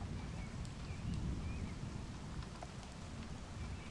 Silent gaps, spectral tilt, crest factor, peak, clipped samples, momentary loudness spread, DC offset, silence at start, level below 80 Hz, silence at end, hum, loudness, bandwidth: none; -6 dB/octave; 14 dB; -30 dBFS; under 0.1%; 7 LU; under 0.1%; 0 s; -50 dBFS; 0 s; none; -47 LUFS; 11.5 kHz